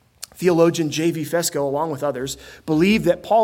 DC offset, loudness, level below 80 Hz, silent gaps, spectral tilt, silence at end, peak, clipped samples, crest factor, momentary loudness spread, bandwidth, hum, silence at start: under 0.1%; -20 LUFS; -52 dBFS; none; -5 dB/octave; 0 s; -2 dBFS; under 0.1%; 18 dB; 12 LU; 17 kHz; none; 0.2 s